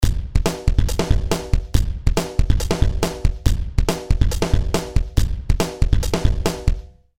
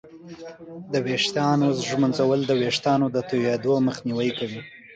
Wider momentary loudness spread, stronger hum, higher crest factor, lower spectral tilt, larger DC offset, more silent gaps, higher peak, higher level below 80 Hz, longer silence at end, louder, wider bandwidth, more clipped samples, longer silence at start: second, 3 LU vs 19 LU; neither; about the same, 16 dB vs 14 dB; about the same, -5.5 dB/octave vs -5.5 dB/octave; first, 4% vs under 0.1%; neither; first, -2 dBFS vs -10 dBFS; first, -20 dBFS vs -64 dBFS; about the same, 0 s vs 0 s; about the same, -22 LUFS vs -23 LUFS; first, 16.5 kHz vs 9.2 kHz; neither; about the same, 0 s vs 0.05 s